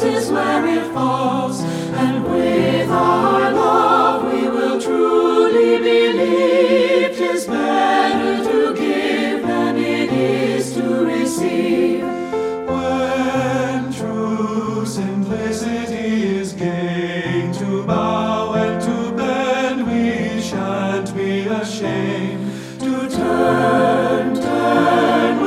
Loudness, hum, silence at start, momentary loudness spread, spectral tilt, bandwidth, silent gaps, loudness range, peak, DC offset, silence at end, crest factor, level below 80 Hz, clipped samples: -17 LUFS; none; 0 s; 8 LU; -5.5 dB/octave; 15 kHz; none; 6 LU; -2 dBFS; under 0.1%; 0 s; 14 dB; -52 dBFS; under 0.1%